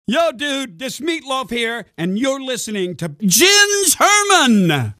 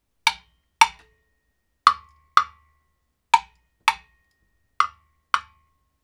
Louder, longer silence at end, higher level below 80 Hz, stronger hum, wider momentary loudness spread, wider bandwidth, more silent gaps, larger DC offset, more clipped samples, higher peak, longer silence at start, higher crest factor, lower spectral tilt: first, -15 LUFS vs -22 LUFS; second, 0.05 s vs 0.65 s; about the same, -58 dBFS vs -60 dBFS; neither; about the same, 13 LU vs 11 LU; about the same, 16 kHz vs 17.5 kHz; neither; neither; neither; about the same, 0 dBFS vs 0 dBFS; second, 0.1 s vs 0.25 s; second, 16 dB vs 26 dB; first, -2.5 dB/octave vs 1.5 dB/octave